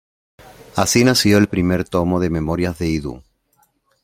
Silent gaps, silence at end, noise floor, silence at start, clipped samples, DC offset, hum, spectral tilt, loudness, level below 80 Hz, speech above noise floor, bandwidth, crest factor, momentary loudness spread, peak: none; 0.85 s; -62 dBFS; 0.75 s; under 0.1%; under 0.1%; none; -5 dB/octave; -17 LUFS; -42 dBFS; 45 dB; 16.5 kHz; 18 dB; 10 LU; -2 dBFS